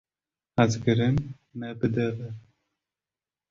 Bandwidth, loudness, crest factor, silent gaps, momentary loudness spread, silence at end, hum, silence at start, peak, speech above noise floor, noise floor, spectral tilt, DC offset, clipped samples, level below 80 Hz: 7.6 kHz; -26 LUFS; 24 dB; none; 16 LU; 1.1 s; none; 0.55 s; -6 dBFS; over 64 dB; under -90 dBFS; -7 dB/octave; under 0.1%; under 0.1%; -52 dBFS